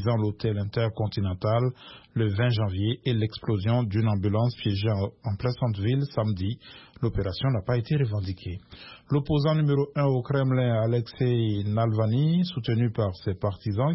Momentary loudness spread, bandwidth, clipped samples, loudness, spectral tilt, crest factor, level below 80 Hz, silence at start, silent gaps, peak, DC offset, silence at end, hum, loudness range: 7 LU; 5.8 kHz; under 0.1%; -26 LUFS; -11.5 dB/octave; 14 dB; -50 dBFS; 0 s; none; -12 dBFS; under 0.1%; 0 s; none; 3 LU